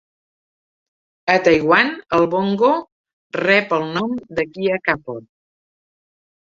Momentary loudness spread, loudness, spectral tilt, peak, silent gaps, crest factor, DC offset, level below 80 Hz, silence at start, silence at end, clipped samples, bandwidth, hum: 10 LU; -18 LUFS; -6 dB/octave; -2 dBFS; 2.92-3.04 s, 3.13-3.30 s; 18 dB; under 0.1%; -56 dBFS; 1.25 s; 1.25 s; under 0.1%; 7.4 kHz; none